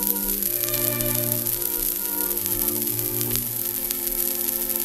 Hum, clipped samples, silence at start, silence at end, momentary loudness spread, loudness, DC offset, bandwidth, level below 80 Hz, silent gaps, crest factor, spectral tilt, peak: none; under 0.1%; 0 s; 0 s; 2 LU; -22 LUFS; under 0.1%; 16.5 kHz; -46 dBFS; none; 24 dB; -2.5 dB/octave; 0 dBFS